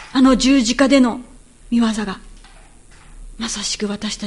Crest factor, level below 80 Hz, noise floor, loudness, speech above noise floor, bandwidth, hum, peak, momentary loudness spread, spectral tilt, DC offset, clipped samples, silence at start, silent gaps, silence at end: 18 dB; -40 dBFS; -44 dBFS; -17 LUFS; 27 dB; 11.5 kHz; none; 0 dBFS; 15 LU; -3.5 dB/octave; under 0.1%; under 0.1%; 0 s; none; 0 s